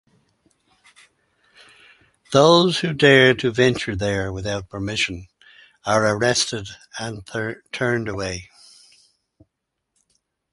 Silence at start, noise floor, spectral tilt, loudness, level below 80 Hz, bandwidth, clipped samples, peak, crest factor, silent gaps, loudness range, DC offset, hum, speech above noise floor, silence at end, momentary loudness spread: 2.3 s; -79 dBFS; -4.5 dB/octave; -19 LUFS; -48 dBFS; 11.5 kHz; under 0.1%; 0 dBFS; 22 dB; none; 11 LU; under 0.1%; none; 59 dB; 2.1 s; 17 LU